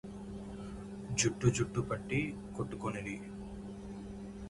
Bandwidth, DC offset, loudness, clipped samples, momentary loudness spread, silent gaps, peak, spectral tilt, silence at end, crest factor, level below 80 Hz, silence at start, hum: 11.5 kHz; under 0.1%; -37 LUFS; under 0.1%; 14 LU; none; -14 dBFS; -5 dB/octave; 0 s; 22 dB; -54 dBFS; 0.05 s; none